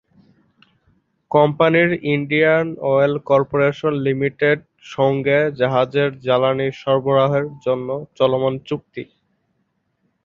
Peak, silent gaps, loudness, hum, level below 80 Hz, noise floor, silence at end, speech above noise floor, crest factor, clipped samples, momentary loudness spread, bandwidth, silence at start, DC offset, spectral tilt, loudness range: -2 dBFS; none; -18 LUFS; none; -58 dBFS; -69 dBFS; 1.2 s; 51 dB; 18 dB; under 0.1%; 8 LU; 7 kHz; 1.3 s; under 0.1%; -8 dB/octave; 3 LU